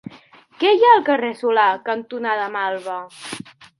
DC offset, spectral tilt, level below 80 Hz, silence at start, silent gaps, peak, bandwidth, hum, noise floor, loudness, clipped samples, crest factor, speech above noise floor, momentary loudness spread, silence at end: under 0.1%; -4 dB/octave; -72 dBFS; 0.1 s; none; 0 dBFS; 11.5 kHz; none; -48 dBFS; -18 LUFS; under 0.1%; 18 dB; 30 dB; 19 LU; 0.4 s